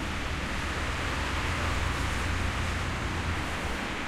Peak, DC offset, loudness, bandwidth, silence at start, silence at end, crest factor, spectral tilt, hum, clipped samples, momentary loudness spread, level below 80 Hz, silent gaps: -18 dBFS; under 0.1%; -31 LUFS; 15 kHz; 0 s; 0 s; 12 dB; -4.5 dB/octave; none; under 0.1%; 3 LU; -36 dBFS; none